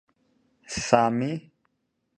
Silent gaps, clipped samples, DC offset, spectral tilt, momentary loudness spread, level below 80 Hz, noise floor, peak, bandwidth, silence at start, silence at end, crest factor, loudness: none; under 0.1%; under 0.1%; -5 dB/octave; 14 LU; -58 dBFS; -76 dBFS; -2 dBFS; 11 kHz; 0.7 s; 0.75 s; 26 dB; -25 LUFS